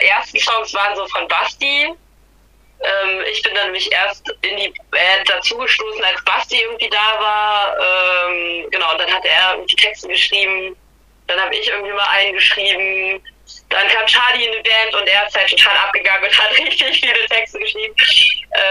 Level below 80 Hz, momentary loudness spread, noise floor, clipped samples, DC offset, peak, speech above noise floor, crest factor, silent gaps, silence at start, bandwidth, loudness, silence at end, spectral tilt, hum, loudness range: -52 dBFS; 9 LU; -50 dBFS; under 0.1%; under 0.1%; 0 dBFS; 35 dB; 16 dB; none; 0 s; 14.5 kHz; -13 LUFS; 0 s; 0 dB/octave; none; 6 LU